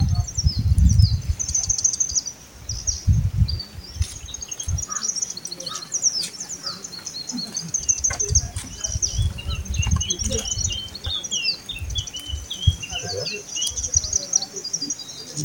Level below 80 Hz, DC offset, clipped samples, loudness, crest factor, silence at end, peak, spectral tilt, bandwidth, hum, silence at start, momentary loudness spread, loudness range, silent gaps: -30 dBFS; under 0.1%; under 0.1%; -23 LUFS; 20 dB; 0 s; -4 dBFS; -2.5 dB/octave; 17 kHz; none; 0 s; 11 LU; 4 LU; none